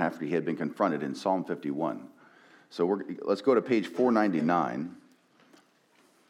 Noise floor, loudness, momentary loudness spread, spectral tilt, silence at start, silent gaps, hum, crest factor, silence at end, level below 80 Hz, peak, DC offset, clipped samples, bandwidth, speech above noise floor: -64 dBFS; -29 LUFS; 9 LU; -7 dB/octave; 0 s; none; none; 18 dB; 1.3 s; -88 dBFS; -12 dBFS; under 0.1%; under 0.1%; 12.5 kHz; 36 dB